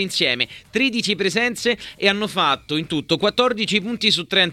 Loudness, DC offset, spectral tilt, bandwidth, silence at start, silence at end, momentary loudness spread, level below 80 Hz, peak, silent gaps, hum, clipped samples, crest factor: -19 LUFS; under 0.1%; -3.5 dB/octave; 16 kHz; 0 s; 0 s; 5 LU; -56 dBFS; -2 dBFS; none; none; under 0.1%; 18 dB